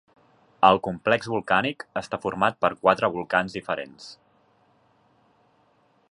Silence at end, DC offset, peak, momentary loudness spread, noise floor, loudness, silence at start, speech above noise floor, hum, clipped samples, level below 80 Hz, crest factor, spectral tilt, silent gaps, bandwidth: 2 s; under 0.1%; -2 dBFS; 13 LU; -63 dBFS; -24 LUFS; 0.6 s; 40 dB; none; under 0.1%; -60 dBFS; 24 dB; -5.5 dB/octave; none; 11 kHz